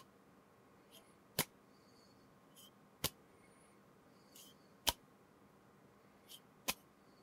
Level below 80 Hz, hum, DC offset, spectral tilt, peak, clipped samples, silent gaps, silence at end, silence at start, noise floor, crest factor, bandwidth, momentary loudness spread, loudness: -70 dBFS; none; under 0.1%; -1.5 dB/octave; -12 dBFS; under 0.1%; none; 0 s; 0 s; -67 dBFS; 38 dB; 16 kHz; 26 LU; -42 LUFS